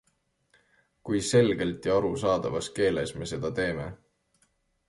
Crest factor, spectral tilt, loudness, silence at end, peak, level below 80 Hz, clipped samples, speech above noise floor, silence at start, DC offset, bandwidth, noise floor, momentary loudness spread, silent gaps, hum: 20 dB; -5 dB/octave; -27 LUFS; 0.95 s; -10 dBFS; -54 dBFS; under 0.1%; 46 dB; 1.05 s; under 0.1%; 11.5 kHz; -73 dBFS; 10 LU; none; none